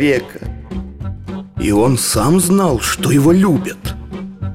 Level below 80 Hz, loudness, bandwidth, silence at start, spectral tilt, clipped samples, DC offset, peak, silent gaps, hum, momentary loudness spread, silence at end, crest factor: -32 dBFS; -14 LUFS; 16.5 kHz; 0 s; -5.5 dB/octave; under 0.1%; under 0.1%; -4 dBFS; none; none; 17 LU; 0 s; 12 dB